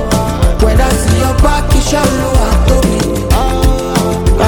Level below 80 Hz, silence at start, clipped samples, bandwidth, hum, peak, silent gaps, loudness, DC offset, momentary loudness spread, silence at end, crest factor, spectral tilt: -12 dBFS; 0 s; under 0.1%; 18 kHz; none; 0 dBFS; none; -12 LUFS; under 0.1%; 3 LU; 0 s; 10 dB; -5.5 dB/octave